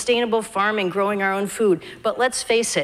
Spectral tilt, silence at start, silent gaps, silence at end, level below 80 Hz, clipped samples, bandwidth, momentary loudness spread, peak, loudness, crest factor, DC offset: -3 dB/octave; 0 s; none; 0 s; -60 dBFS; under 0.1%; 15.5 kHz; 3 LU; -6 dBFS; -21 LUFS; 14 dB; under 0.1%